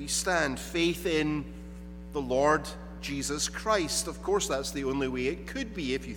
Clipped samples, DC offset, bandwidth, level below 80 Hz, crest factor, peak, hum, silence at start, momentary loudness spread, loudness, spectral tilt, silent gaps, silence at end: under 0.1%; under 0.1%; 19 kHz; -46 dBFS; 18 dB; -12 dBFS; none; 0 s; 12 LU; -30 LUFS; -3.5 dB/octave; none; 0 s